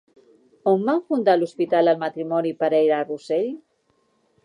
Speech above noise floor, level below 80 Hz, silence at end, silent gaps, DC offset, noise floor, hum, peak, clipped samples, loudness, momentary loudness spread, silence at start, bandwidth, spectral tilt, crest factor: 46 dB; -78 dBFS; 0.9 s; none; under 0.1%; -66 dBFS; none; -6 dBFS; under 0.1%; -22 LUFS; 6 LU; 0.65 s; 10.5 kHz; -7 dB/octave; 16 dB